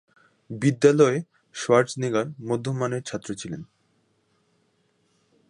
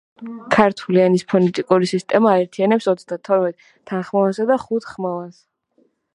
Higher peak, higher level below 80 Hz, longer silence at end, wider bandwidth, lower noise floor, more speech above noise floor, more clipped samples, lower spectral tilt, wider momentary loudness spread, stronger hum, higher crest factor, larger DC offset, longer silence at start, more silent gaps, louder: second, -4 dBFS vs 0 dBFS; about the same, -66 dBFS vs -62 dBFS; first, 1.85 s vs 0.85 s; about the same, 11.5 kHz vs 11 kHz; first, -68 dBFS vs -62 dBFS; about the same, 45 dB vs 44 dB; neither; about the same, -6 dB/octave vs -6.5 dB/octave; first, 17 LU vs 11 LU; neither; about the same, 22 dB vs 18 dB; neither; first, 0.5 s vs 0.2 s; neither; second, -24 LUFS vs -18 LUFS